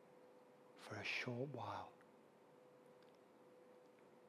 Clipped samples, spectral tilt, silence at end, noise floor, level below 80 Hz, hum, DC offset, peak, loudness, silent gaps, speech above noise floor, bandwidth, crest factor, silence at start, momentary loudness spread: under 0.1%; -5 dB/octave; 0 s; -68 dBFS; -86 dBFS; none; under 0.1%; -32 dBFS; -48 LUFS; none; 20 dB; 14 kHz; 22 dB; 0 s; 23 LU